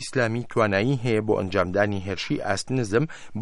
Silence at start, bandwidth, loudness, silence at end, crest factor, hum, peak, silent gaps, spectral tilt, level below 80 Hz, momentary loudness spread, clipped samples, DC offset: 0 s; 11.5 kHz; -24 LUFS; 0 s; 18 dB; none; -6 dBFS; none; -6 dB/octave; -54 dBFS; 5 LU; under 0.1%; under 0.1%